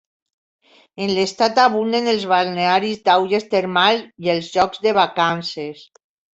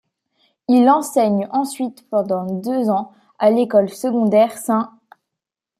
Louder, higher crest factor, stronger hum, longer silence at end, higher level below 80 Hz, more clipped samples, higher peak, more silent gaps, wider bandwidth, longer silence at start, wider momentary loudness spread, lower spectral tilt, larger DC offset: about the same, -18 LUFS vs -18 LUFS; about the same, 18 dB vs 16 dB; neither; second, 0.55 s vs 0.9 s; first, -60 dBFS vs -68 dBFS; neither; about the same, -2 dBFS vs -2 dBFS; neither; second, 8.2 kHz vs 15 kHz; first, 1 s vs 0.7 s; about the same, 7 LU vs 9 LU; second, -4.5 dB/octave vs -6.5 dB/octave; neither